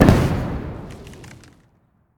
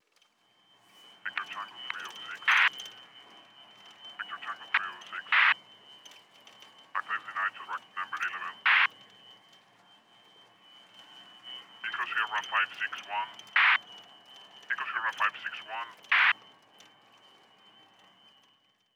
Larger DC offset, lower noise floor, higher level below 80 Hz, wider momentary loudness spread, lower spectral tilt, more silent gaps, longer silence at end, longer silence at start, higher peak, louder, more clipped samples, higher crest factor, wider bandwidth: neither; second, -60 dBFS vs -69 dBFS; first, -30 dBFS vs under -90 dBFS; second, 24 LU vs 27 LU; first, -7.5 dB/octave vs 0.5 dB/octave; neither; second, 0.9 s vs 2.6 s; second, 0 s vs 1.25 s; first, 0 dBFS vs -12 dBFS; first, -21 LUFS vs -29 LUFS; first, 0.1% vs under 0.1%; about the same, 20 dB vs 22 dB; about the same, 18.5 kHz vs over 20 kHz